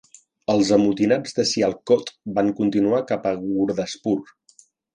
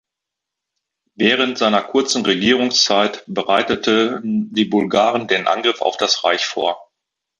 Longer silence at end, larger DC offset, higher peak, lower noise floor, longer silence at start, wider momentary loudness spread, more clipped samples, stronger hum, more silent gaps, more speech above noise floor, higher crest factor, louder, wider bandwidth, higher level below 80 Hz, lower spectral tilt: first, 0.7 s vs 0.55 s; neither; about the same, -4 dBFS vs -2 dBFS; second, -56 dBFS vs -83 dBFS; second, 0.5 s vs 1.2 s; about the same, 7 LU vs 6 LU; neither; neither; neither; second, 35 dB vs 66 dB; about the same, 18 dB vs 16 dB; second, -21 LUFS vs -17 LUFS; about the same, 10 kHz vs 11 kHz; about the same, -58 dBFS vs -60 dBFS; first, -5 dB/octave vs -3 dB/octave